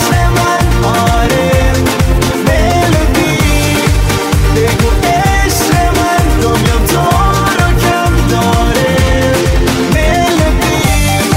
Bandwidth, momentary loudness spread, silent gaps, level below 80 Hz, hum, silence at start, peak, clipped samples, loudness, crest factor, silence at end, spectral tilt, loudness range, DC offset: 16.5 kHz; 1 LU; none; -16 dBFS; none; 0 s; 0 dBFS; under 0.1%; -10 LUFS; 10 dB; 0 s; -5 dB/octave; 0 LU; under 0.1%